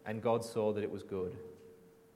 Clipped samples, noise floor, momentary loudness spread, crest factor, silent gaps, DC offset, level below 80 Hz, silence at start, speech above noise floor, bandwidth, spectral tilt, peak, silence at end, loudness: under 0.1%; -59 dBFS; 18 LU; 18 dB; none; under 0.1%; -76 dBFS; 0.05 s; 23 dB; 16 kHz; -6.5 dB/octave; -20 dBFS; 0.25 s; -36 LUFS